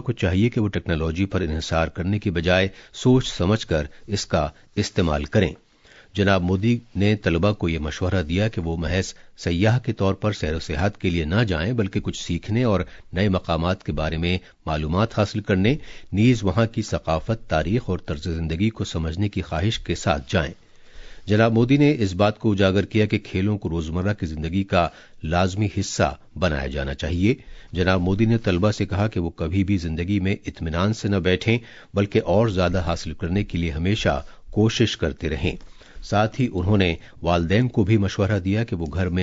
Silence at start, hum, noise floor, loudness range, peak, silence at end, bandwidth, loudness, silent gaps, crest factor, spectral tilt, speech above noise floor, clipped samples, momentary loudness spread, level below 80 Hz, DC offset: 0 s; none; -51 dBFS; 3 LU; -4 dBFS; 0 s; 7.8 kHz; -23 LUFS; none; 18 dB; -6.5 dB/octave; 30 dB; under 0.1%; 7 LU; -38 dBFS; under 0.1%